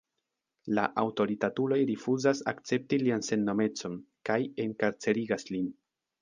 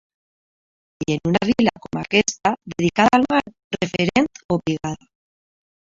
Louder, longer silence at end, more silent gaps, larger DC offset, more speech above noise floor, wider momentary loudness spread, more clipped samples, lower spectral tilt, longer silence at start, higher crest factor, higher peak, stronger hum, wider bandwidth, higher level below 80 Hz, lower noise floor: second, -30 LUFS vs -20 LUFS; second, 0.5 s vs 1 s; second, none vs 3.64-3.71 s, 4.45-4.49 s; neither; second, 55 dB vs over 70 dB; second, 7 LU vs 13 LU; neither; about the same, -5.5 dB/octave vs -5 dB/octave; second, 0.65 s vs 1 s; about the same, 20 dB vs 22 dB; second, -10 dBFS vs 0 dBFS; neither; first, 9.8 kHz vs 7.8 kHz; second, -72 dBFS vs -52 dBFS; second, -85 dBFS vs under -90 dBFS